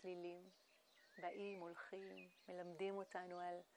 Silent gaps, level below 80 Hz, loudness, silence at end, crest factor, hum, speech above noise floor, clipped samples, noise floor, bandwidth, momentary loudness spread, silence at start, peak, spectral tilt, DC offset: none; under -90 dBFS; -53 LUFS; 0 s; 16 dB; none; 23 dB; under 0.1%; -74 dBFS; 19.5 kHz; 12 LU; 0 s; -36 dBFS; -5.5 dB/octave; under 0.1%